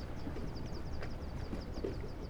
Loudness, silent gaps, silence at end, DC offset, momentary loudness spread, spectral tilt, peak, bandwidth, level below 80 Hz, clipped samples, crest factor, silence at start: -44 LUFS; none; 0 s; under 0.1%; 2 LU; -7 dB/octave; -26 dBFS; 12 kHz; -44 dBFS; under 0.1%; 14 dB; 0 s